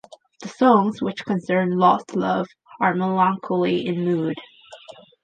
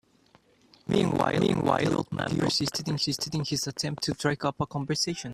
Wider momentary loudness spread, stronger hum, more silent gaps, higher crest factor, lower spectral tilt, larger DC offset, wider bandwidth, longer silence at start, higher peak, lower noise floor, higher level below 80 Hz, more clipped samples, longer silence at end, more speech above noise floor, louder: first, 11 LU vs 5 LU; neither; neither; about the same, 18 dB vs 20 dB; first, -7 dB/octave vs -4.5 dB/octave; neither; second, 9 kHz vs 15.5 kHz; second, 0.4 s vs 0.85 s; first, -4 dBFS vs -8 dBFS; second, -44 dBFS vs -62 dBFS; second, -68 dBFS vs -58 dBFS; neither; first, 0.5 s vs 0 s; second, 24 dB vs 34 dB; first, -21 LUFS vs -28 LUFS